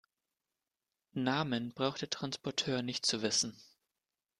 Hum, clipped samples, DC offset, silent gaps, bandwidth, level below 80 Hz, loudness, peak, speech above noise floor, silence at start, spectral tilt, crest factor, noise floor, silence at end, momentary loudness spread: none; under 0.1%; under 0.1%; none; 12.5 kHz; -74 dBFS; -34 LUFS; -16 dBFS; over 55 dB; 1.15 s; -3 dB/octave; 22 dB; under -90 dBFS; 0.75 s; 7 LU